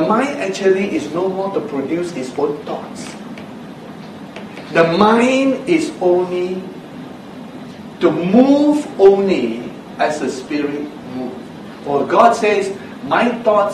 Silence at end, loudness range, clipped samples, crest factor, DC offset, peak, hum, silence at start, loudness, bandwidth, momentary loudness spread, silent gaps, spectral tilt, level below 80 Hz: 0 s; 7 LU; under 0.1%; 16 dB; under 0.1%; 0 dBFS; none; 0 s; -16 LUFS; 12.5 kHz; 21 LU; none; -6 dB/octave; -56 dBFS